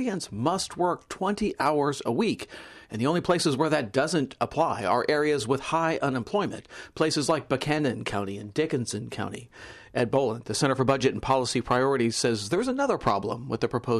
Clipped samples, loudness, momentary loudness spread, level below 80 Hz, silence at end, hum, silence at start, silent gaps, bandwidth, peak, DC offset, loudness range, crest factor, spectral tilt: under 0.1%; -27 LUFS; 9 LU; -56 dBFS; 0 s; none; 0 s; none; 13.5 kHz; -12 dBFS; under 0.1%; 3 LU; 16 dB; -5 dB/octave